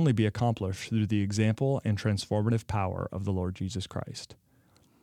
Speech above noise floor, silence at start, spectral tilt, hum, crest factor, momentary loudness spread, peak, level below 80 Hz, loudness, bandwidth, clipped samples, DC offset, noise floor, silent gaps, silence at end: 35 dB; 0 s; -6.5 dB/octave; none; 16 dB; 10 LU; -12 dBFS; -58 dBFS; -30 LUFS; 11.5 kHz; under 0.1%; under 0.1%; -64 dBFS; none; 0.7 s